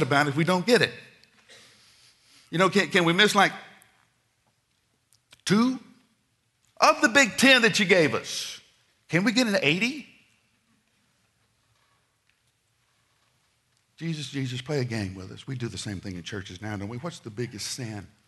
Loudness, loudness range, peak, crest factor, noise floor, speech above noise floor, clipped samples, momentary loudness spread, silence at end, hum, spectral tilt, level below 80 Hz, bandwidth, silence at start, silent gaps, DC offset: -24 LUFS; 13 LU; -2 dBFS; 24 dB; -71 dBFS; 47 dB; under 0.1%; 18 LU; 0.2 s; none; -4 dB/octave; -68 dBFS; 12 kHz; 0 s; none; under 0.1%